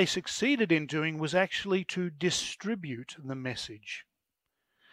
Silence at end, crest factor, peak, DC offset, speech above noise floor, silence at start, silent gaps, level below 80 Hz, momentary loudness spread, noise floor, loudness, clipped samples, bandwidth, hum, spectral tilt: 0.9 s; 20 dB; -12 dBFS; under 0.1%; 54 dB; 0 s; none; -68 dBFS; 13 LU; -85 dBFS; -31 LUFS; under 0.1%; 15.5 kHz; none; -4 dB/octave